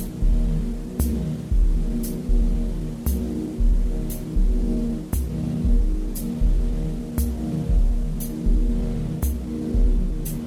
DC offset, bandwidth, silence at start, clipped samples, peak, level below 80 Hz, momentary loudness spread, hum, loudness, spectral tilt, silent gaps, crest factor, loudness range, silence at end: under 0.1%; 16 kHz; 0 s; under 0.1%; -8 dBFS; -22 dBFS; 5 LU; none; -26 LUFS; -7.5 dB/octave; none; 12 dB; 1 LU; 0 s